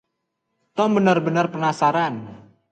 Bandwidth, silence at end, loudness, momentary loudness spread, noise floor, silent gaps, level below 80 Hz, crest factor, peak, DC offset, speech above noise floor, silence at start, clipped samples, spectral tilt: 9 kHz; 0.3 s; -20 LUFS; 14 LU; -77 dBFS; none; -66 dBFS; 18 dB; -4 dBFS; under 0.1%; 57 dB; 0.75 s; under 0.1%; -6.5 dB/octave